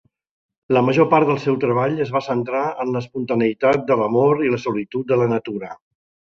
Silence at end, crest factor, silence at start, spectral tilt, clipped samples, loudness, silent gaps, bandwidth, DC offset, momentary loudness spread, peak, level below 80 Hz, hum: 0.55 s; 18 dB; 0.7 s; -8 dB/octave; under 0.1%; -19 LUFS; none; 7.4 kHz; under 0.1%; 9 LU; -2 dBFS; -60 dBFS; none